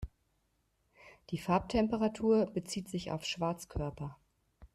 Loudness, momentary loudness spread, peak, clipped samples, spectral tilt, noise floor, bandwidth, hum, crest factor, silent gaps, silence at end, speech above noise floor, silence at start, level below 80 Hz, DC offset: -34 LUFS; 13 LU; -18 dBFS; under 0.1%; -6 dB/octave; -77 dBFS; 13.5 kHz; none; 18 dB; none; 0.1 s; 43 dB; 0 s; -54 dBFS; under 0.1%